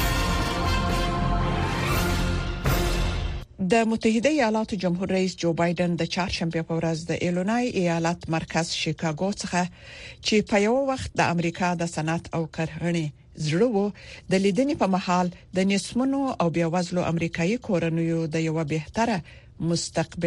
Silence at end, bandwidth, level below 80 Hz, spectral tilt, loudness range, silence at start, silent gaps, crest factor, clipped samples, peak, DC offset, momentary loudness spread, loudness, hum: 0 s; 15 kHz; -36 dBFS; -5.5 dB/octave; 2 LU; 0 s; none; 16 dB; under 0.1%; -8 dBFS; under 0.1%; 6 LU; -25 LUFS; none